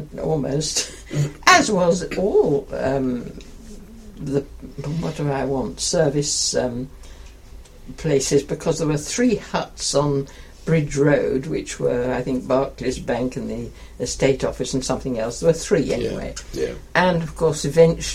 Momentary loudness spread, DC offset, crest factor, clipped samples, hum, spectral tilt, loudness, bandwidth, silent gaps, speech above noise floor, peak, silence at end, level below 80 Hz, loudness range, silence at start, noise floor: 12 LU; under 0.1%; 20 dB; under 0.1%; none; -4.5 dB/octave; -21 LUFS; 16 kHz; none; 20 dB; 0 dBFS; 0 s; -40 dBFS; 4 LU; 0 s; -41 dBFS